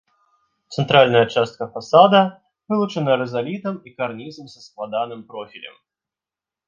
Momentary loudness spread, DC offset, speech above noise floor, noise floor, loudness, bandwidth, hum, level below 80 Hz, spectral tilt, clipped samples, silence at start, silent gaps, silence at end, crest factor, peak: 21 LU; under 0.1%; 70 dB; -89 dBFS; -18 LUFS; 7.4 kHz; none; -64 dBFS; -6 dB/octave; under 0.1%; 0.7 s; none; 1 s; 20 dB; 0 dBFS